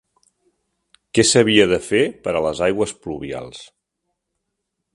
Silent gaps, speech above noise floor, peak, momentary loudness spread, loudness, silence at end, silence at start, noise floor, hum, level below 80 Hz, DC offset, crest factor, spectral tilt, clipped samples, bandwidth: none; 59 dB; 0 dBFS; 17 LU; -18 LUFS; 1.3 s; 1.15 s; -77 dBFS; none; -50 dBFS; under 0.1%; 20 dB; -3.5 dB/octave; under 0.1%; 11.5 kHz